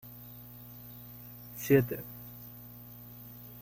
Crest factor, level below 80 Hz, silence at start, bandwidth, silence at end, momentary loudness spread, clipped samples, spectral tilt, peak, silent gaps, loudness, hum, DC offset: 24 dB; -62 dBFS; 0 s; 17 kHz; 0 s; 21 LU; under 0.1%; -7 dB/octave; -12 dBFS; none; -31 LUFS; 60 Hz at -50 dBFS; under 0.1%